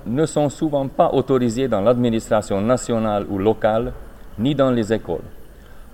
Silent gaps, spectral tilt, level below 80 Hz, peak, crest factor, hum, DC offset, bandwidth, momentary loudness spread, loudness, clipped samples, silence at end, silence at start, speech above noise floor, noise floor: none; -6.5 dB/octave; -40 dBFS; -2 dBFS; 18 dB; none; under 0.1%; 16.5 kHz; 7 LU; -20 LUFS; under 0.1%; 0 s; 0.05 s; 20 dB; -39 dBFS